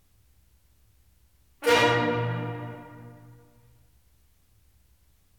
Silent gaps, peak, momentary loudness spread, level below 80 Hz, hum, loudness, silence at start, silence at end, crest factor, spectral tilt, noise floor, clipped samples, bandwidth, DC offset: none; -8 dBFS; 26 LU; -62 dBFS; none; -25 LUFS; 1.6 s; 2.05 s; 24 dB; -4.5 dB/octave; -64 dBFS; under 0.1%; 18 kHz; under 0.1%